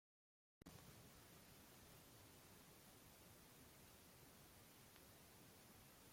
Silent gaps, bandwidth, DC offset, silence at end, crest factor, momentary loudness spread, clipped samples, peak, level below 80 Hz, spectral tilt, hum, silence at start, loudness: none; 16.5 kHz; under 0.1%; 0 s; 20 dB; 1 LU; under 0.1%; -46 dBFS; -80 dBFS; -3.5 dB/octave; none; 0.6 s; -65 LUFS